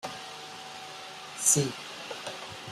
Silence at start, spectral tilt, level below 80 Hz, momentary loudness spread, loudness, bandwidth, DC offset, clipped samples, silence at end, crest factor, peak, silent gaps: 0 s; -2.5 dB/octave; -70 dBFS; 18 LU; -29 LUFS; 15.5 kHz; under 0.1%; under 0.1%; 0 s; 26 dB; -8 dBFS; none